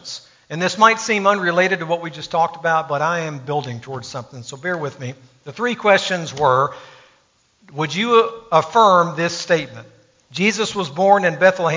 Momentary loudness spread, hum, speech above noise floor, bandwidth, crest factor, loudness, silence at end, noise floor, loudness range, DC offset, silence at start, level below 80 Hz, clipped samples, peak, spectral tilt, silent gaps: 18 LU; none; 41 dB; 7.6 kHz; 18 dB; -18 LUFS; 0 s; -59 dBFS; 5 LU; under 0.1%; 0.05 s; -62 dBFS; under 0.1%; 0 dBFS; -4 dB/octave; none